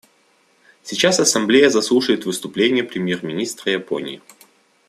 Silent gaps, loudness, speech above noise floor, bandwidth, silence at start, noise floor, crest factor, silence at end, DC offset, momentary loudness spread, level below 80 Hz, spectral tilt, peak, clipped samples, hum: none; -18 LUFS; 40 dB; 14.5 kHz; 0.85 s; -59 dBFS; 18 dB; 0.7 s; under 0.1%; 13 LU; -64 dBFS; -3 dB/octave; -2 dBFS; under 0.1%; none